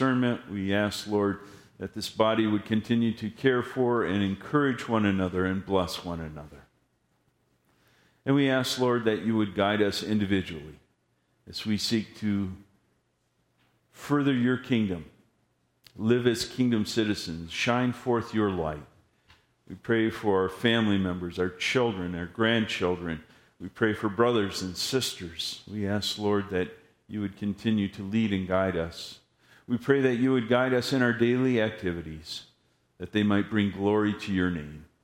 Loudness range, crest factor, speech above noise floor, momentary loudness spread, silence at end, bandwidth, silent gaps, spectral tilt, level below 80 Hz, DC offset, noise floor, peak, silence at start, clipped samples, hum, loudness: 5 LU; 22 dB; 46 dB; 12 LU; 0.2 s; 16 kHz; none; -5.5 dB/octave; -58 dBFS; under 0.1%; -73 dBFS; -6 dBFS; 0 s; under 0.1%; none; -27 LUFS